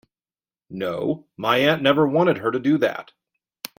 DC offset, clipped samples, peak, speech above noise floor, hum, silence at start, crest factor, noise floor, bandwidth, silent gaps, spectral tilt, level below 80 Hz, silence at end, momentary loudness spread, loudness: under 0.1%; under 0.1%; -4 dBFS; over 69 dB; none; 0.7 s; 18 dB; under -90 dBFS; 16.5 kHz; none; -6 dB/octave; -64 dBFS; 0.75 s; 15 LU; -21 LUFS